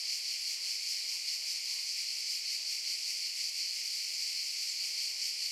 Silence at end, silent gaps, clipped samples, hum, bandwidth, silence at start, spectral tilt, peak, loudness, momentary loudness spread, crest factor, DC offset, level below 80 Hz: 0 s; none; under 0.1%; none; 16.5 kHz; 0 s; 6.5 dB/octave; -22 dBFS; -33 LUFS; 1 LU; 14 dB; under 0.1%; under -90 dBFS